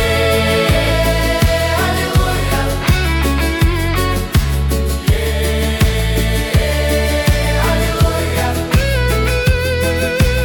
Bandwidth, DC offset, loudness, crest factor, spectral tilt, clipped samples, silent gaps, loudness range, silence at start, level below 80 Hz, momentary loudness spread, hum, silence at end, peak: 19 kHz; under 0.1%; -15 LUFS; 12 dB; -5 dB/octave; under 0.1%; none; 1 LU; 0 s; -18 dBFS; 3 LU; none; 0 s; -2 dBFS